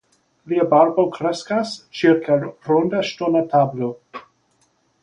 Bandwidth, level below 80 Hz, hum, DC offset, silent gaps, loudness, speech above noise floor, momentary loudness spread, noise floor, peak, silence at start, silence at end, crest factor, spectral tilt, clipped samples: 10 kHz; -62 dBFS; none; under 0.1%; none; -19 LUFS; 45 dB; 13 LU; -63 dBFS; -2 dBFS; 0.45 s; 0.85 s; 18 dB; -6.5 dB/octave; under 0.1%